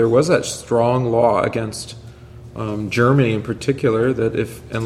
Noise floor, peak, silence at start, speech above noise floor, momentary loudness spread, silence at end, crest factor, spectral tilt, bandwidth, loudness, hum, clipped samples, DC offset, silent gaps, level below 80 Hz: -38 dBFS; -2 dBFS; 0 s; 20 dB; 13 LU; 0 s; 18 dB; -6 dB/octave; 14.5 kHz; -18 LUFS; none; under 0.1%; under 0.1%; none; -46 dBFS